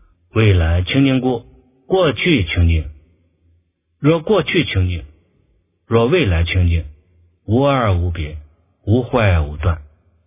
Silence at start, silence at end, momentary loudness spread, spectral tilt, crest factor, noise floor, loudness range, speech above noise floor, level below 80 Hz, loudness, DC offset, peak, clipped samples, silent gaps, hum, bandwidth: 0.35 s; 0.45 s; 12 LU; -11 dB/octave; 16 dB; -61 dBFS; 2 LU; 46 dB; -26 dBFS; -17 LUFS; under 0.1%; 0 dBFS; under 0.1%; none; none; 3.8 kHz